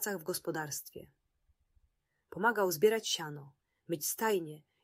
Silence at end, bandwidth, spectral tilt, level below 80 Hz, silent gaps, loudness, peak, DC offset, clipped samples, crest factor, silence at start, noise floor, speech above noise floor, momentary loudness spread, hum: 0.25 s; 16 kHz; -3 dB/octave; -76 dBFS; none; -33 LUFS; -16 dBFS; under 0.1%; under 0.1%; 20 dB; 0 s; -77 dBFS; 43 dB; 20 LU; none